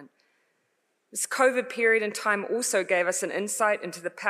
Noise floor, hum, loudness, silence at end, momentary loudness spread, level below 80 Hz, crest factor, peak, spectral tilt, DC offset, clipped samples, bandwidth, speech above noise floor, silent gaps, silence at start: -74 dBFS; none; -25 LUFS; 0 s; 7 LU; under -90 dBFS; 18 dB; -10 dBFS; -2 dB/octave; under 0.1%; under 0.1%; 15.5 kHz; 48 dB; none; 0 s